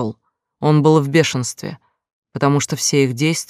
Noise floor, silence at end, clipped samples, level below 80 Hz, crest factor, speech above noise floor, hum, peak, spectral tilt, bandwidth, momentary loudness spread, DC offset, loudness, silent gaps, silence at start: -55 dBFS; 0.05 s; under 0.1%; -62 dBFS; 16 dB; 39 dB; none; -2 dBFS; -5 dB/octave; 15 kHz; 15 LU; under 0.1%; -17 LUFS; 2.13-2.22 s; 0 s